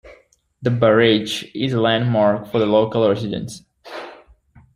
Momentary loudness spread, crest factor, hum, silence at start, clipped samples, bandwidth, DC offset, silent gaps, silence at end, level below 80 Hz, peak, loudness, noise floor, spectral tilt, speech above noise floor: 20 LU; 18 dB; none; 0.05 s; under 0.1%; 15 kHz; under 0.1%; none; 0.6 s; -54 dBFS; -2 dBFS; -18 LUFS; -53 dBFS; -6 dB/octave; 36 dB